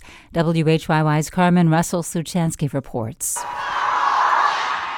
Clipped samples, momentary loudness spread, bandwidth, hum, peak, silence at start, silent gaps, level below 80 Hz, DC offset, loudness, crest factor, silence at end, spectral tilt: under 0.1%; 8 LU; 17.5 kHz; none; -4 dBFS; 0 s; none; -48 dBFS; under 0.1%; -20 LUFS; 14 dB; 0 s; -5 dB/octave